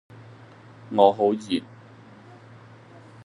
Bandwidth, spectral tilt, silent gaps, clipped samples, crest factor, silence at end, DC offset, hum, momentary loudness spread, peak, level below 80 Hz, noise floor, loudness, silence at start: 11 kHz; -6.5 dB/octave; none; under 0.1%; 24 dB; 1.65 s; under 0.1%; none; 11 LU; -2 dBFS; -74 dBFS; -48 dBFS; -22 LUFS; 0.9 s